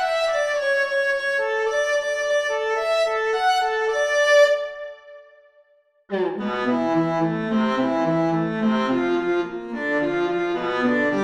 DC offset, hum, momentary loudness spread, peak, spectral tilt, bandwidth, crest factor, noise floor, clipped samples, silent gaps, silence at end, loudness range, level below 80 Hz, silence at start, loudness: under 0.1%; none; 6 LU; -6 dBFS; -5 dB/octave; 13.5 kHz; 16 dB; -59 dBFS; under 0.1%; none; 0 s; 3 LU; -58 dBFS; 0 s; -21 LUFS